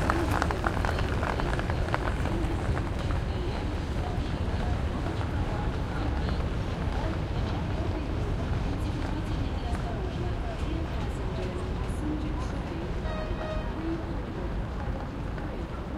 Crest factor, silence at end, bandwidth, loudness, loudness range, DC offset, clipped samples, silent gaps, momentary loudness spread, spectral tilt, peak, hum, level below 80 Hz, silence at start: 24 dB; 0 s; 14 kHz; -31 LUFS; 3 LU; under 0.1%; under 0.1%; none; 5 LU; -7 dB/octave; -6 dBFS; none; -34 dBFS; 0 s